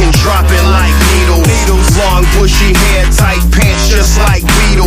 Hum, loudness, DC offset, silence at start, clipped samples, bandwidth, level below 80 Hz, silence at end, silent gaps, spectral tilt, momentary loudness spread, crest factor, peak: none; -9 LUFS; under 0.1%; 0 s; 0.4%; 16 kHz; -10 dBFS; 0 s; none; -4.5 dB/octave; 1 LU; 6 dB; 0 dBFS